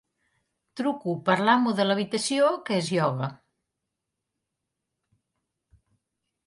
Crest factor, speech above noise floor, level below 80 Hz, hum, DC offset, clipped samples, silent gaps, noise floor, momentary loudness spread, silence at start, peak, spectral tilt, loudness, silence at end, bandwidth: 20 dB; 59 dB; -74 dBFS; none; under 0.1%; under 0.1%; none; -84 dBFS; 10 LU; 0.75 s; -8 dBFS; -5 dB/octave; -25 LUFS; 3.1 s; 11.5 kHz